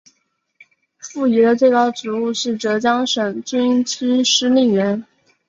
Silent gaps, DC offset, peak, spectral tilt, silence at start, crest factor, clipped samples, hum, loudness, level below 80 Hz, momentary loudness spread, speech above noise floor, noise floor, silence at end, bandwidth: none; under 0.1%; -2 dBFS; -3.5 dB/octave; 1.05 s; 16 dB; under 0.1%; none; -17 LUFS; -64 dBFS; 8 LU; 51 dB; -67 dBFS; 0.45 s; 7.8 kHz